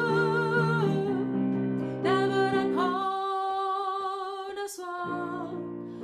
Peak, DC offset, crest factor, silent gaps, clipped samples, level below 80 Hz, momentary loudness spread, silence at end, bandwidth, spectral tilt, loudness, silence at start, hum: -14 dBFS; under 0.1%; 14 dB; none; under 0.1%; -66 dBFS; 10 LU; 0 s; 14.5 kHz; -6.5 dB/octave; -29 LUFS; 0 s; none